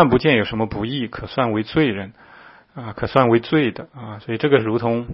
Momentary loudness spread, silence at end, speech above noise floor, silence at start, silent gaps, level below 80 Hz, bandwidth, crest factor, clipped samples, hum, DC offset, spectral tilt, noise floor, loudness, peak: 18 LU; 0 s; 27 dB; 0 s; none; -46 dBFS; 5.8 kHz; 20 dB; under 0.1%; none; under 0.1%; -9.5 dB/octave; -46 dBFS; -19 LUFS; 0 dBFS